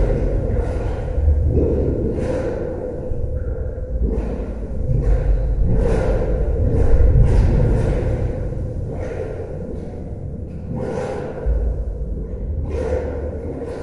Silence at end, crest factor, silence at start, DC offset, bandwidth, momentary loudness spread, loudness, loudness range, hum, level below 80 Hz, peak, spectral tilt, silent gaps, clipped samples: 0 s; 16 dB; 0 s; under 0.1%; 6.8 kHz; 11 LU; -22 LUFS; 8 LU; none; -22 dBFS; -2 dBFS; -9.5 dB/octave; none; under 0.1%